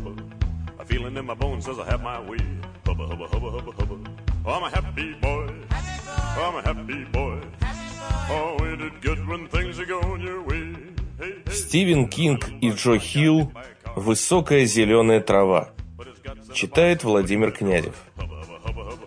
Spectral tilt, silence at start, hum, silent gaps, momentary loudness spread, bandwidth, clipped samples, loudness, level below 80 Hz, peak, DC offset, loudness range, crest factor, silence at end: -5 dB/octave; 0 s; none; none; 16 LU; 10.5 kHz; under 0.1%; -24 LUFS; -32 dBFS; -4 dBFS; under 0.1%; 9 LU; 20 dB; 0 s